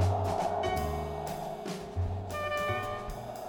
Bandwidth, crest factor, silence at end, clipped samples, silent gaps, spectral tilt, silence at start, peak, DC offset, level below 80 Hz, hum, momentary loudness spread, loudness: 19.5 kHz; 16 dB; 0 s; under 0.1%; none; -6 dB/octave; 0 s; -18 dBFS; under 0.1%; -46 dBFS; none; 7 LU; -34 LUFS